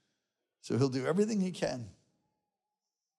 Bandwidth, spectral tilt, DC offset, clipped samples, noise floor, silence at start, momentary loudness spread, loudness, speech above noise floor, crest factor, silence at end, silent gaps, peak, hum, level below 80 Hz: 12 kHz; -6.5 dB/octave; under 0.1%; under 0.1%; under -90 dBFS; 0.65 s; 17 LU; -32 LUFS; over 58 dB; 18 dB; 1.3 s; none; -16 dBFS; none; -72 dBFS